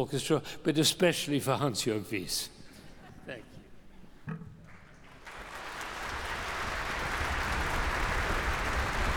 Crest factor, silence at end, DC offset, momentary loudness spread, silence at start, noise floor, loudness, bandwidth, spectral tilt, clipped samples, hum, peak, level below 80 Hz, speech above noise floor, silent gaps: 20 dB; 0 s; under 0.1%; 20 LU; 0 s; -52 dBFS; -31 LUFS; over 20 kHz; -4 dB/octave; under 0.1%; none; -12 dBFS; -42 dBFS; 22 dB; none